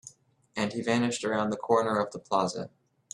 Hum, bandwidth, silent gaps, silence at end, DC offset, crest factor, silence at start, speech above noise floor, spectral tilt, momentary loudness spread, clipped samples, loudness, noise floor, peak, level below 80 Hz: none; 11.5 kHz; none; 0.45 s; under 0.1%; 20 dB; 0.05 s; 27 dB; -4.5 dB/octave; 11 LU; under 0.1%; -29 LUFS; -55 dBFS; -10 dBFS; -70 dBFS